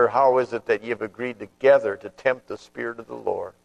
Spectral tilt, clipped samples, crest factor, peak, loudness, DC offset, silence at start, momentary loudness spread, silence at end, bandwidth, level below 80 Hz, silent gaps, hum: -6 dB/octave; under 0.1%; 18 dB; -6 dBFS; -24 LUFS; under 0.1%; 0 s; 14 LU; 0.15 s; 8.6 kHz; -66 dBFS; none; none